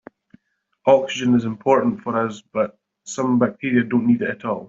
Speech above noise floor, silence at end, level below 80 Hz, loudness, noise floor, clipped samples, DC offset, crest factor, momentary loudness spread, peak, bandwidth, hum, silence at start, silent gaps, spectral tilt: 48 dB; 0 s; -62 dBFS; -20 LUFS; -67 dBFS; under 0.1%; under 0.1%; 18 dB; 8 LU; -2 dBFS; 7.8 kHz; none; 0.85 s; none; -6 dB/octave